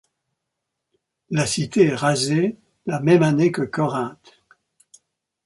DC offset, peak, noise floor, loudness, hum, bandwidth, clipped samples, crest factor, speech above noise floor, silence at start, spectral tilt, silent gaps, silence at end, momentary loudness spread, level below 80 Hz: under 0.1%; -4 dBFS; -80 dBFS; -20 LUFS; none; 11.5 kHz; under 0.1%; 20 dB; 61 dB; 1.3 s; -5.5 dB/octave; none; 1.3 s; 11 LU; -60 dBFS